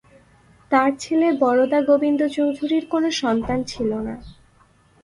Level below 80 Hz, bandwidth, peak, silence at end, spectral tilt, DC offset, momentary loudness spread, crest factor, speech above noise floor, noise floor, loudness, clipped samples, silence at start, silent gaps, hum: -50 dBFS; 11.5 kHz; -4 dBFS; 0.7 s; -5 dB/octave; under 0.1%; 7 LU; 18 dB; 36 dB; -56 dBFS; -20 LUFS; under 0.1%; 0.7 s; none; none